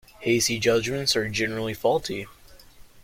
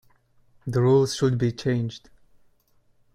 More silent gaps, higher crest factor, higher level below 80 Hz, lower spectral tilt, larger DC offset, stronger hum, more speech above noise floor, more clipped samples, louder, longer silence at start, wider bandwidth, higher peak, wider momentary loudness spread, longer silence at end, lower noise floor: neither; about the same, 18 dB vs 16 dB; about the same, -52 dBFS vs -54 dBFS; second, -3.5 dB/octave vs -6.5 dB/octave; neither; neither; second, 24 dB vs 40 dB; neither; about the same, -24 LUFS vs -23 LUFS; second, 0.2 s vs 0.65 s; first, 16.5 kHz vs 12 kHz; about the same, -8 dBFS vs -8 dBFS; second, 11 LU vs 16 LU; second, 0 s vs 1.15 s; second, -48 dBFS vs -62 dBFS